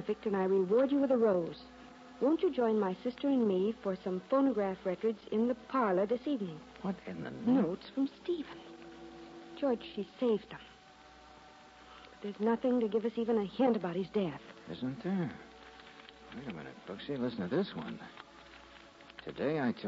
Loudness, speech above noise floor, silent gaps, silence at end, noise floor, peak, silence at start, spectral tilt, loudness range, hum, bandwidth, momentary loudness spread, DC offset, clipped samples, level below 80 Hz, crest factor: -33 LUFS; 24 dB; none; 0 s; -57 dBFS; -20 dBFS; 0 s; -8 dB/octave; 8 LU; none; 7.8 kHz; 22 LU; under 0.1%; under 0.1%; -68 dBFS; 14 dB